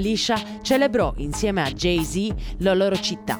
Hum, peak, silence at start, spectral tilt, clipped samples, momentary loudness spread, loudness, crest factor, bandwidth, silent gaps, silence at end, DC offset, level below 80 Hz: none; -6 dBFS; 0 s; -4.5 dB/octave; under 0.1%; 6 LU; -22 LUFS; 16 dB; over 20 kHz; none; 0 s; under 0.1%; -36 dBFS